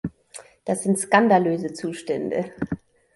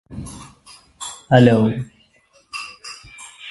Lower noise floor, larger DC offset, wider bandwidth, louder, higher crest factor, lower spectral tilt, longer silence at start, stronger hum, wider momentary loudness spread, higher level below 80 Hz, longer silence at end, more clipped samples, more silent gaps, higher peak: second, -46 dBFS vs -57 dBFS; neither; about the same, 11.5 kHz vs 11.5 kHz; second, -23 LUFS vs -16 LUFS; about the same, 20 dB vs 20 dB; second, -5 dB/octave vs -6.5 dB/octave; about the same, 0.05 s vs 0.1 s; neither; second, 18 LU vs 23 LU; second, -56 dBFS vs -48 dBFS; first, 0.4 s vs 0 s; neither; neither; second, -4 dBFS vs 0 dBFS